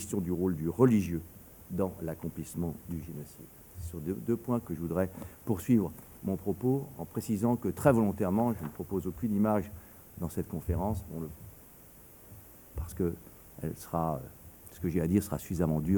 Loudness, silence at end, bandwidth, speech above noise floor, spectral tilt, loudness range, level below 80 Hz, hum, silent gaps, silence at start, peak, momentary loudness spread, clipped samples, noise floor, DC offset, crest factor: -32 LUFS; 0 s; over 20 kHz; 23 dB; -8 dB/octave; 8 LU; -50 dBFS; none; none; 0 s; -10 dBFS; 22 LU; under 0.1%; -54 dBFS; under 0.1%; 22 dB